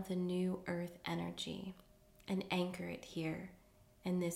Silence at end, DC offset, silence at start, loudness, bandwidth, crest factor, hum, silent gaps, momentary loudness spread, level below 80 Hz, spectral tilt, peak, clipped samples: 0 s; under 0.1%; 0 s; -42 LUFS; 16 kHz; 16 dB; none; none; 12 LU; -70 dBFS; -6 dB/octave; -26 dBFS; under 0.1%